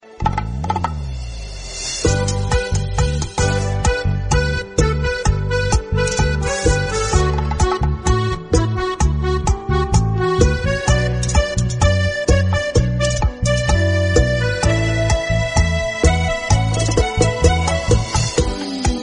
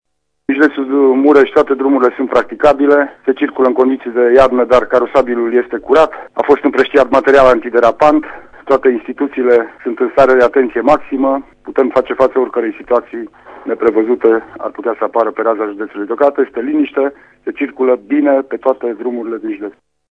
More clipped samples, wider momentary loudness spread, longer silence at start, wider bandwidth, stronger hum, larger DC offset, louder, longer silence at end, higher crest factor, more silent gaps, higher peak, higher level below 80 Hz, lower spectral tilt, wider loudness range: second, under 0.1% vs 0.3%; second, 5 LU vs 12 LU; second, 0.05 s vs 0.5 s; first, 10.5 kHz vs 8.6 kHz; neither; neither; second, -18 LUFS vs -13 LUFS; second, 0 s vs 0.4 s; about the same, 16 dB vs 12 dB; neither; about the same, 0 dBFS vs 0 dBFS; first, -22 dBFS vs -44 dBFS; about the same, -5 dB/octave vs -6 dB/octave; second, 2 LU vs 5 LU